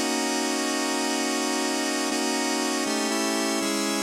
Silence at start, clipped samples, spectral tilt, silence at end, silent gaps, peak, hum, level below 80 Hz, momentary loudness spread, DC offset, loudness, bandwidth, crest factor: 0 s; under 0.1%; -1.5 dB/octave; 0 s; none; -12 dBFS; none; -72 dBFS; 1 LU; under 0.1%; -25 LUFS; 16 kHz; 14 dB